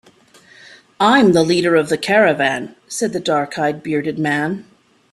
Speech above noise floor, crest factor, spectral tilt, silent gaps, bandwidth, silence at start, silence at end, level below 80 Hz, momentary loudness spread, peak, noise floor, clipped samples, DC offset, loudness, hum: 32 dB; 16 dB; -5 dB/octave; none; 13 kHz; 1 s; 0.5 s; -58 dBFS; 11 LU; -2 dBFS; -49 dBFS; under 0.1%; under 0.1%; -16 LUFS; none